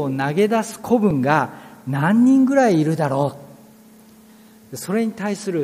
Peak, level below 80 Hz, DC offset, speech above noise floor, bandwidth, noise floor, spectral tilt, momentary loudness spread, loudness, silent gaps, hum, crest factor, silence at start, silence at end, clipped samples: -2 dBFS; -58 dBFS; under 0.1%; 29 dB; 15.5 kHz; -47 dBFS; -6.5 dB/octave; 13 LU; -19 LUFS; none; none; 18 dB; 0 s; 0 s; under 0.1%